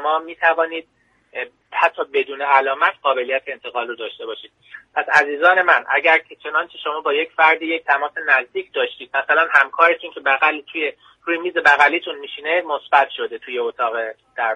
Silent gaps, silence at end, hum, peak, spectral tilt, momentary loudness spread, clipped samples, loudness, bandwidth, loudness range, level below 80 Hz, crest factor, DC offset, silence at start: none; 0 s; none; 0 dBFS; -2.5 dB/octave; 13 LU; under 0.1%; -18 LUFS; 10.5 kHz; 4 LU; -70 dBFS; 20 dB; under 0.1%; 0 s